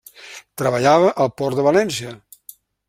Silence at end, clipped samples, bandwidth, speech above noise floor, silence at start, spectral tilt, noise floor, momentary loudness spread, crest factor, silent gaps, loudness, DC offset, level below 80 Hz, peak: 0.7 s; under 0.1%; 16 kHz; 29 dB; 0.2 s; -5 dB/octave; -46 dBFS; 22 LU; 18 dB; none; -18 LUFS; under 0.1%; -58 dBFS; -2 dBFS